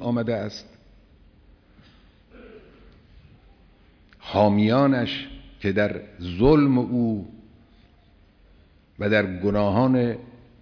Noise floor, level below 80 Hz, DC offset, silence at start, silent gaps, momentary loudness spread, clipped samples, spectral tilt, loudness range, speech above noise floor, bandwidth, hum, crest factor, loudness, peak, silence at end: -56 dBFS; -46 dBFS; under 0.1%; 0 s; none; 16 LU; under 0.1%; -8 dB/octave; 8 LU; 34 dB; 5.4 kHz; none; 20 dB; -22 LUFS; -6 dBFS; 0.3 s